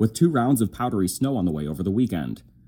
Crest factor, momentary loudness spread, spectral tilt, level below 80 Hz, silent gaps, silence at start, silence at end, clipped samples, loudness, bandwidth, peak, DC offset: 16 dB; 7 LU; -6.5 dB/octave; -50 dBFS; none; 0 s; 0.25 s; under 0.1%; -23 LUFS; 17.5 kHz; -8 dBFS; under 0.1%